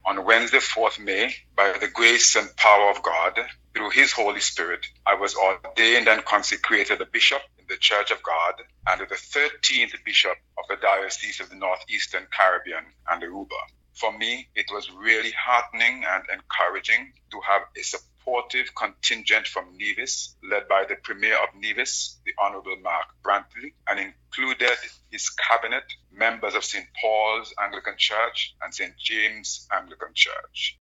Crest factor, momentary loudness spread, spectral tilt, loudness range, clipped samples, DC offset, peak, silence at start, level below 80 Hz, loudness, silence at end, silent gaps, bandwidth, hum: 22 dB; 12 LU; 0.5 dB/octave; 7 LU; under 0.1%; under 0.1%; -2 dBFS; 0.05 s; -60 dBFS; -22 LUFS; 0.15 s; none; 11 kHz; none